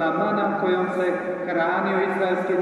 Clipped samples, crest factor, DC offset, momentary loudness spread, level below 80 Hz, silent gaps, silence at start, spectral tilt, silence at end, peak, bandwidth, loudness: under 0.1%; 12 dB; under 0.1%; 2 LU; -66 dBFS; none; 0 s; -7.5 dB/octave; 0 s; -10 dBFS; 10.5 kHz; -23 LUFS